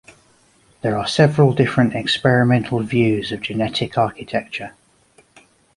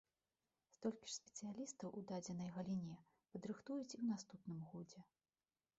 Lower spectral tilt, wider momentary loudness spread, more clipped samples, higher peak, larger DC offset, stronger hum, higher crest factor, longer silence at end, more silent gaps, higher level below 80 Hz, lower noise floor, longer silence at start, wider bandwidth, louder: about the same, -6.5 dB/octave vs -7 dB/octave; about the same, 11 LU vs 11 LU; neither; first, -2 dBFS vs -32 dBFS; neither; neither; about the same, 18 dB vs 18 dB; first, 1.05 s vs 0.75 s; neither; first, -52 dBFS vs -84 dBFS; second, -55 dBFS vs under -90 dBFS; about the same, 0.85 s vs 0.8 s; first, 11.5 kHz vs 8 kHz; first, -18 LUFS vs -50 LUFS